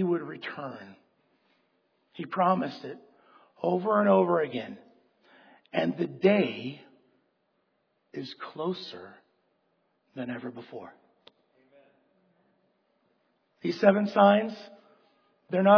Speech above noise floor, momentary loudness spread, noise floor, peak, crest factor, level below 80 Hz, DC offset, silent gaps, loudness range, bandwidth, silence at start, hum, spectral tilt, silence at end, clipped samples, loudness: 47 dB; 22 LU; -74 dBFS; -6 dBFS; 24 dB; -84 dBFS; under 0.1%; none; 17 LU; 5.4 kHz; 0 s; none; -8 dB/octave; 0 s; under 0.1%; -27 LUFS